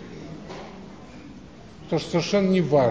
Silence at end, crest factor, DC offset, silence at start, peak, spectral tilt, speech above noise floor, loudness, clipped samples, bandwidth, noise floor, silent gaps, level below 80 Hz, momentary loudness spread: 0 s; 18 dB; 0.2%; 0 s; -8 dBFS; -6.5 dB/octave; 23 dB; -23 LUFS; under 0.1%; 8 kHz; -44 dBFS; none; -52 dBFS; 24 LU